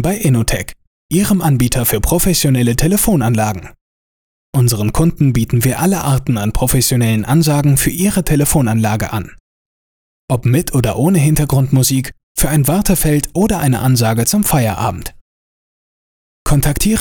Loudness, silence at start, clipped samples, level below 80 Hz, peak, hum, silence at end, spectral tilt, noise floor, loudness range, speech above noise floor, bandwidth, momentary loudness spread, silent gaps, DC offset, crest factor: -14 LUFS; 0 s; under 0.1%; -28 dBFS; 0 dBFS; none; 0 s; -5.5 dB/octave; under -90 dBFS; 2 LU; over 77 dB; over 20 kHz; 7 LU; 0.87-1.09 s, 3.81-4.53 s, 9.40-10.28 s, 12.23-12.35 s, 15.21-16.45 s; under 0.1%; 14 dB